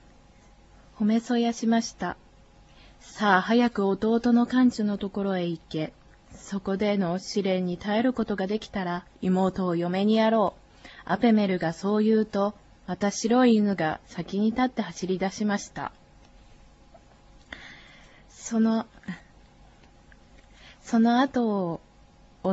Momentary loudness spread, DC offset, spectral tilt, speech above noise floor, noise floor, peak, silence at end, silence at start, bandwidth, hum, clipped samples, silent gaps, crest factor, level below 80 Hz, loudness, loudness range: 16 LU; under 0.1%; -6 dB/octave; 30 dB; -55 dBFS; -8 dBFS; 0 s; 1 s; 8 kHz; none; under 0.1%; none; 20 dB; -56 dBFS; -26 LUFS; 8 LU